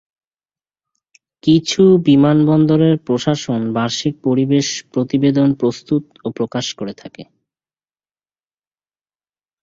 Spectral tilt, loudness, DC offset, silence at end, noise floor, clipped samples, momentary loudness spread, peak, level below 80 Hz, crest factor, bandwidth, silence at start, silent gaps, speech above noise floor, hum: -6 dB/octave; -15 LUFS; under 0.1%; 2.4 s; under -90 dBFS; under 0.1%; 11 LU; -2 dBFS; -54 dBFS; 16 dB; 7.8 kHz; 1.45 s; none; over 75 dB; none